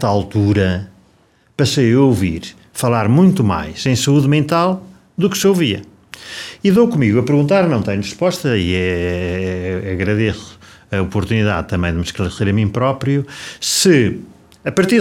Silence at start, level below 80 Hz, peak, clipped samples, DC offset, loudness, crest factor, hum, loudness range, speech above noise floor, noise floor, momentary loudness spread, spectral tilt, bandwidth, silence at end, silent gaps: 0 s; -40 dBFS; -2 dBFS; under 0.1%; under 0.1%; -16 LUFS; 14 dB; none; 4 LU; 39 dB; -54 dBFS; 14 LU; -5.5 dB/octave; 17 kHz; 0 s; none